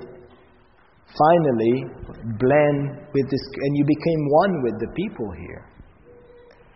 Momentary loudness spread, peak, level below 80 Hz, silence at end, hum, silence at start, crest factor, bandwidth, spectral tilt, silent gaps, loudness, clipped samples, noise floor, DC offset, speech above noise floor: 18 LU; -4 dBFS; -50 dBFS; 0.95 s; none; 0 s; 18 dB; 5.8 kHz; -6.5 dB/octave; none; -21 LUFS; under 0.1%; -56 dBFS; under 0.1%; 35 dB